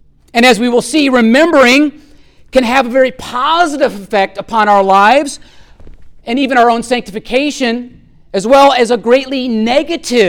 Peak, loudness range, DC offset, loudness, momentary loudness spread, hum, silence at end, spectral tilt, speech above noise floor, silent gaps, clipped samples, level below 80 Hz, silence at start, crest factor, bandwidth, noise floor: 0 dBFS; 3 LU; under 0.1%; -11 LUFS; 10 LU; none; 0 s; -3.5 dB/octave; 31 dB; none; under 0.1%; -42 dBFS; 0.35 s; 12 dB; 17.5 kHz; -41 dBFS